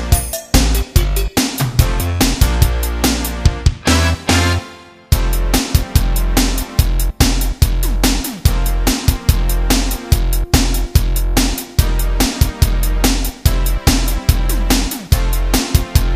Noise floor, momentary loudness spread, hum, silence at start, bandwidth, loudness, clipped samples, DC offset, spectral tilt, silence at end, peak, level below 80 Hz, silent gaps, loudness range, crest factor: -36 dBFS; 3 LU; none; 0 s; 16 kHz; -16 LUFS; 0.1%; under 0.1%; -4.5 dB/octave; 0 s; 0 dBFS; -16 dBFS; none; 1 LU; 14 dB